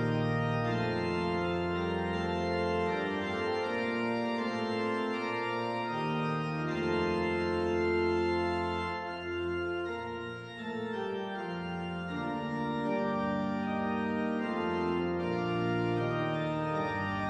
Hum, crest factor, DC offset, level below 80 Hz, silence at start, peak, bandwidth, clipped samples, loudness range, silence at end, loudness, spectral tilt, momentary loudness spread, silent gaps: none; 14 dB; under 0.1%; -62 dBFS; 0 s; -18 dBFS; 8.8 kHz; under 0.1%; 5 LU; 0 s; -33 LUFS; -7 dB/octave; 6 LU; none